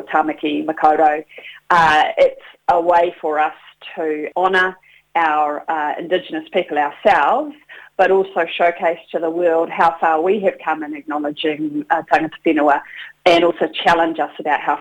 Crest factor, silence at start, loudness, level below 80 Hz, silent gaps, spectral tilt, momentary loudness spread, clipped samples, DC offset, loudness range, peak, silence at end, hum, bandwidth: 16 dB; 0 s; -17 LUFS; -54 dBFS; none; -5 dB/octave; 10 LU; under 0.1%; under 0.1%; 3 LU; 0 dBFS; 0 s; none; 10.5 kHz